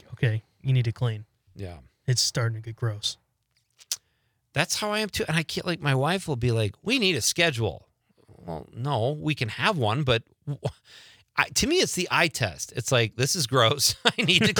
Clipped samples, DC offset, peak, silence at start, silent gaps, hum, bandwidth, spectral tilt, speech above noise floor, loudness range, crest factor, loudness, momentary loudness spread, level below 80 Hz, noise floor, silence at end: under 0.1%; under 0.1%; -2 dBFS; 0.1 s; none; none; 19.5 kHz; -3.5 dB/octave; 47 dB; 6 LU; 24 dB; -25 LUFS; 12 LU; -56 dBFS; -72 dBFS; 0 s